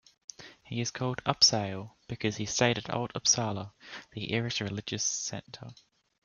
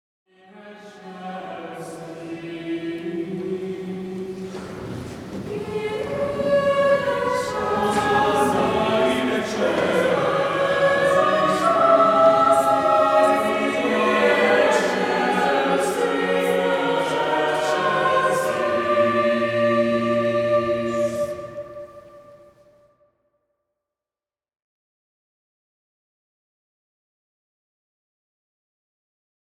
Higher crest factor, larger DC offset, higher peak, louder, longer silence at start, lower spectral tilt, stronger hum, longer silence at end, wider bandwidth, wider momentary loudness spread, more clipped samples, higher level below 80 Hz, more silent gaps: first, 24 dB vs 18 dB; neither; second, -8 dBFS vs -4 dBFS; second, -29 LUFS vs -20 LUFS; second, 0.4 s vs 0.55 s; second, -2.5 dB/octave vs -5 dB/octave; neither; second, 0.5 s vs 7.4 s; second, 11 kHz vs 16 kHz; first, 23 LU vs 16 LU; neither; second, -64 dBFS vs -58 dBFS; neither